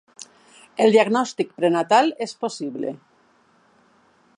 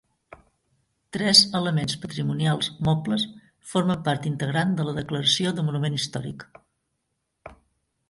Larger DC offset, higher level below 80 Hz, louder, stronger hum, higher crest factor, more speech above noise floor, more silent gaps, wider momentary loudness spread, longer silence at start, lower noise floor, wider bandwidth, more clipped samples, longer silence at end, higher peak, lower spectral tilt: neither; second, -76 dBFS vs -56 dBFS; about the same, -21 LUFS vs -23 LUFS; neither; about the same, 20 dB vs 24 dB; second, 39 dB vs 53 dB; neither; first, 25 LU vs 14 LU; first, 0.8 s vs 0.3 s; second, -59 dBFS vs -77 dBFS; about the same, 11 kHz vs 11.5 kHz; neither; first, 1.4 s vs 0.55 s; about the same, -4 dBFS vs -2 dBFS; about the same, -4.5 dB/octave vs -4.5 dB/octave